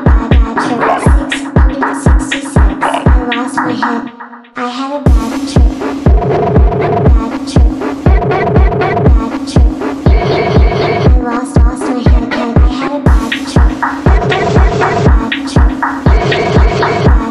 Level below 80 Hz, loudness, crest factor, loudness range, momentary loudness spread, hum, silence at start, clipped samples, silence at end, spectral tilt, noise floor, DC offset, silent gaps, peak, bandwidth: -12 dBFS; -11 LUFS; 10 dB; 3 LU; 4 LU; none; 0 s; under 0.1%; 0 s; -7 dB/octave; -30 dBFS; under 0.1%; none; 0 dBFS; 11.5 kHz